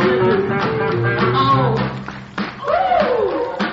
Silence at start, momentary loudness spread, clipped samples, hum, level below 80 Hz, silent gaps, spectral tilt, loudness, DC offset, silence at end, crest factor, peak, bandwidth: 0 s; 11 LU; under 0.1%; none; -44 dBFS; none; -5 dB/octave; -17 LUFS; under 0.1%; 0 s; 14 dB; -4 dBFS; 7.4 kHz